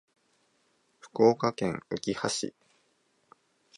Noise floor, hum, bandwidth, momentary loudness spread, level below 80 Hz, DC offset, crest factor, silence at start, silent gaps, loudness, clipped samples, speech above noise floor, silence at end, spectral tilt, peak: -71 dBFS; none; 11.5 kHz; 12 LU; -68 dBFS; under 0.1%; 22 dB; 1.05 s; none; -29 LUFS; under 0.1%; 43 dB; 1.3 s; -4.5 dB/octave; -10 dBFS